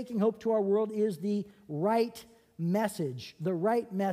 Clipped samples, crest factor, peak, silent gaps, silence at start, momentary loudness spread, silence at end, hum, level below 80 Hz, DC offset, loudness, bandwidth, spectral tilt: under 0.1%; 14 dB; -16 dBFS; none; 0 s; 8 LU; 0 s; none; -74 dBFS; under 0.1%; -31 LUFS; 15.5 kHz; -7 dB/octave